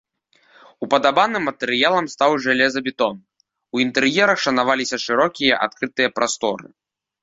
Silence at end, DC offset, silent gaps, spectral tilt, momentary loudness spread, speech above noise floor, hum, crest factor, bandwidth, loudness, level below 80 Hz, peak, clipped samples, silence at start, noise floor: 0.6 s; under 0.1%; none; -3 dB/octave; 7 LU; 40 dB; none; 20 dB; 8 kHz; -19 LUFS; -62 dBFS; -2 dBFS; under 0.1%; 0.8 s; -59 dBFS